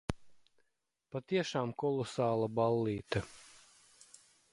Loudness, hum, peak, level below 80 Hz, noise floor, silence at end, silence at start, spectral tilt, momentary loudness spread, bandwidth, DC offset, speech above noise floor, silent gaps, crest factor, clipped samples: -35 LUFS; none; -16 dBFS; -60 dBFS; -83 dBFS; 0.95 s; 0.1 s; -6 dB/octave; 15 LU; 11.5 kHz; under 0.1%; 49 dB; none; 20 dB; under 0.1%